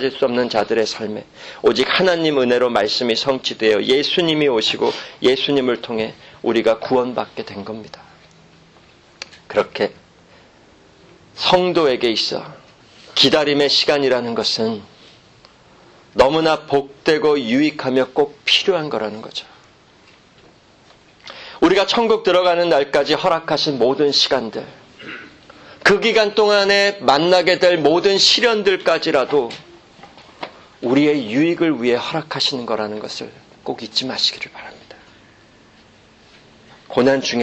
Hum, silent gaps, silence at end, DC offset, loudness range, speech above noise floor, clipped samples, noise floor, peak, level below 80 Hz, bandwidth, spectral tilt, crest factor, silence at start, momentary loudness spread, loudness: none; none; 0 s; under 0.1%; 9 LU; 32 dB; under 0.1%; -50 dBFS; 0 dBFS; -54 dBFS; 9.2 kHz; -4 dB/octave; 18 dB; 0 s; 17 LU; -17 LUFS